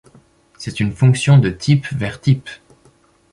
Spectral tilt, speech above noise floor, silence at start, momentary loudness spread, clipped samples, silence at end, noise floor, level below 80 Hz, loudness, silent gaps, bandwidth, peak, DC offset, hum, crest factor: -6.5 dB/octave; 38 dB; 0.6 s; 16 LU; under 0.1%; 0.8 s; -53 dBFS; -46 dBFS; -16 LUFS; none; 11 kHz; -2 dBFS; under 0.1%; none; 16 dB